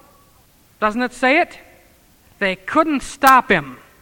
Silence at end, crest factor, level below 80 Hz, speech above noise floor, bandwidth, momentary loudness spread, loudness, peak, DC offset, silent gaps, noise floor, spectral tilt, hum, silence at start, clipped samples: 0.25 s; 20 dB; -48 dBFS; 36 dB; over 20 kHz; 10 LU; -17 LUFS; 0 dBFS; under 0.1%; none; -53 dBFS; -4 dB/octave; none; 0.8 s; under 0.1%